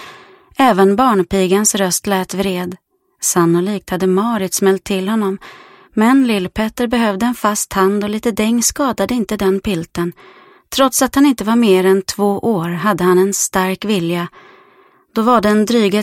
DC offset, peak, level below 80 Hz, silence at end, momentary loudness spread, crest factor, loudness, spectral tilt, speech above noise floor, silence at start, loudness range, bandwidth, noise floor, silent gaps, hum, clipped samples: under 0.1%; 0 dBFS; -46 dBFS; 0 s; 8 LU; 16 dB; -15 LUFS; -4.5 dB/octave; 35 dB; 0 s; 3 LU; 16.5 kHz; -50 dBFS; none; none; under 0.1%